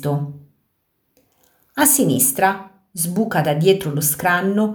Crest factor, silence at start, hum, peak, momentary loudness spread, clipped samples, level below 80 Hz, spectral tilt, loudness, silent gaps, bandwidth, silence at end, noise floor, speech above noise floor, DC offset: 20 dB; 0 s; none; 0 dBFS; 16 LU; under 0.1%; -60 dBFS; -4 dB/octave; -17 LUFS; none; over 20 kHz; 0 s; -69 dBFS; 51 dB; under 0.1%